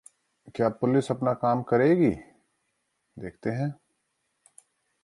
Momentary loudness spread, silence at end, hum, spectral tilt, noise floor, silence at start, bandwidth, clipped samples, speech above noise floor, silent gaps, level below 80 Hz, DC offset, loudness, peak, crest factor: 18 LU; 1.3 s; none; -8 dB/octave; -77 dBFS; 0.45 s; 11.5 kHz; under 0.1%; 52 dB; none; -60 dBFS; under 0.1%; -26 LUFS; -10 dBFS; 18 dB